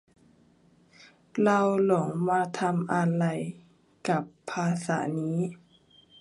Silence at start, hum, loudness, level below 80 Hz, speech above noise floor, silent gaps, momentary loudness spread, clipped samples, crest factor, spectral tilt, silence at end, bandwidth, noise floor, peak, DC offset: 1.35 s; none; -28 LUFS; -72 dBFS; 35 dB; none; 12 LU; under 0.1%; 18 dB; -7 dB/octave; 0.65 s; 11.5 kHz; -61 dBFS; -10 dBFS; under 0.1%